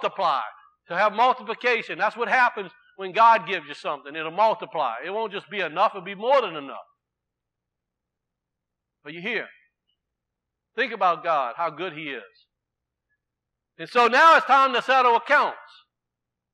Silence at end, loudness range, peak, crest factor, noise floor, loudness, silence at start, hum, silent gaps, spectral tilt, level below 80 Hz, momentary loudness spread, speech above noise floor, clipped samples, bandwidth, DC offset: 0.95 s; 16 LU; -6 dBFS; 18 dB; -84 dBFS; -22 LUFS; 0 s; none; none; -3.5 dB/octave; -88 dBFS; 19 LU; 62 dB; under 0.1%; 11.5 kHz; under 0.1%